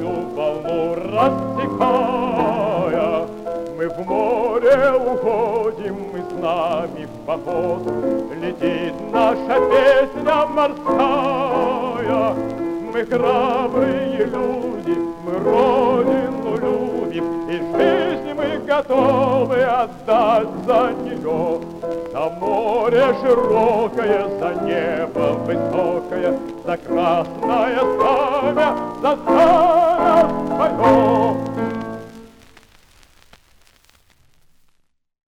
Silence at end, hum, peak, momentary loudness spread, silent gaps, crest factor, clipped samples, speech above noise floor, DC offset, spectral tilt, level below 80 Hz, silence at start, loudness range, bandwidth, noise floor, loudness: 3.1 s; none; -4 dBFS; 10 LU; none; 16 dB; under 0.1%; 44 dB; under 0.1%; -7 dB/octave; -48 dBFS; 0 s; 5 LU; 13.5 kHz; -61 dBFS; -18 LUFS